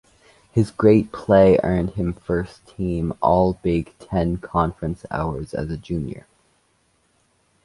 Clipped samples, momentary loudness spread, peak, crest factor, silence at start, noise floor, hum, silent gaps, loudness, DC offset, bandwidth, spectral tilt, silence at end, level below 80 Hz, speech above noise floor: under 0.1%; 13 LU; -2 dBFS; 18 dB; 0.55 s; -64 dBFS; none; none; -21 LUFS; under 0.1%; 11.5 kHz; -8.5 dB/octave; 1.45 s; -40 dBFS; 44 dB